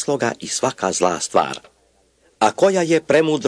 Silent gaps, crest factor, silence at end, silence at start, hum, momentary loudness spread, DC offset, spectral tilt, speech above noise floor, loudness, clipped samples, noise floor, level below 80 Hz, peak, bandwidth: none; 18 dB; 0 s; 0 s; none; 6 LU; under 0.1%; -4 dB/octave; 41 dB; -19 LUFS; under 0.1%; -59 dBFS; -62 dBFS; -2 dBFS; 11 kHz